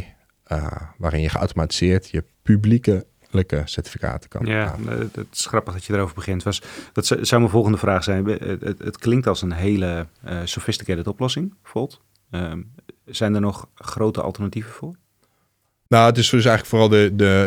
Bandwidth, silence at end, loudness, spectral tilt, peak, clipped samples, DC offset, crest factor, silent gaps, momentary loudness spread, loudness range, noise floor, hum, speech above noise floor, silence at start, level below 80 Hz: 16.5 kHz; 0 s; -21 LUFS; -5.5 dB/octave; 0 dBFS; under 0.1%; under 0.1%; 20 dB; none; 14 LU; 6 LU; -68 dBFS; none; 48 dB; 0 s; -42 dBFS